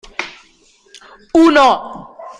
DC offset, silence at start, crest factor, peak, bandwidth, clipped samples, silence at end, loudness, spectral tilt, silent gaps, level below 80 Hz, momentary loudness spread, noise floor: under 0.1%; 0.2 s; 14 dB; -2 dBFS; 10 kHz; under 0.1%; 0.1 s; -12 LUFS; -3.5 dB/octave; none; -48 dBFS; 22 LU; -51 dBFS